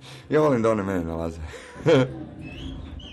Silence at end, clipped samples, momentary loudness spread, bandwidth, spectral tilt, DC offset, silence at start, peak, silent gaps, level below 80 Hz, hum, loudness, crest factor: 0 s; under 0.1%; 17 LU; 12.5 kHz; -7 dB/octave; under 0.1%; 0 s; -10 dBFS; none; -44 dBFS; none; -23 LUFS; 14 dB